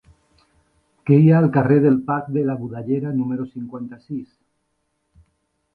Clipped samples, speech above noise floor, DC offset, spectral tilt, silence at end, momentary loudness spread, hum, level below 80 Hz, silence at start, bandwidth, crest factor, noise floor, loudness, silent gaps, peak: under 0.1%; 53 dB; under 0.1%; -11.5 dB/octave; 1.5 s; 18 LU; none; -60 dBFS; 1.05 s; 4.5 kHz; 18 dB; -71 dBFS; -18 LUFS; none; -2 dBFS